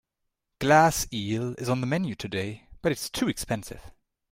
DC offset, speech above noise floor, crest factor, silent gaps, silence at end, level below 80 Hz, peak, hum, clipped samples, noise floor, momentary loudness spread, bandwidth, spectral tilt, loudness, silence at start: under 0.1%; 55 dB; 22 dB; none; 0.4 s; -50 dBFS; -6 dBFS; none; under 0.1%; -81 dBFS; 13 LU; 16 kHz; -4.5 dB/octave; -27 LUFS; 0.6 s